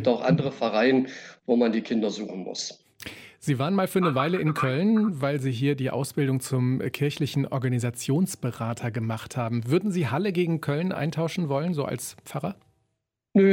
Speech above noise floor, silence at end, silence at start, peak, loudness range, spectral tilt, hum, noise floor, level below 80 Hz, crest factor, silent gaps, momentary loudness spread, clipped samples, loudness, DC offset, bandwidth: 54 dB; 0 s; 0 s; -10 dBFS; 3 LU; -6.5 dB/octave; none; -79 dBFS; -66 dBFS; 16 dB; none; 11 LU; under 0.1%; -26 LUFS; under 0.1%; 17 kHz